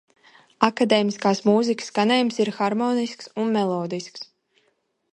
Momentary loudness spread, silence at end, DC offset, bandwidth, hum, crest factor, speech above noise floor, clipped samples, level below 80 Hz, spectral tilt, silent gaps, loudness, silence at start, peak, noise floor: 11 LU; 0.9 s; under 0.1%; 11 kHz; none; 22 dB; 48 dB; under 0.1%; -68 dBFS; -5 dB/octave; none; -22 LUFS; 0.6 s; 0 dBFS; -69 dBFS